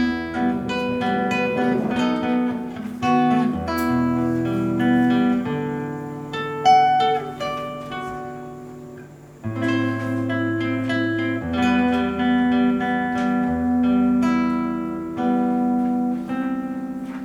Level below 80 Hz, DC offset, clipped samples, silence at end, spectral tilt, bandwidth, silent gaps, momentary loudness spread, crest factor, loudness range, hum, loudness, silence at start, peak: -50 dBFS; under 0.1%; under 0.1%; 0 s; -6.5 dB/octave; 13 kHz; none; 12 LU; 16 dB; 5 LU; none; -21 LUFS; 0 s; -6 dBFS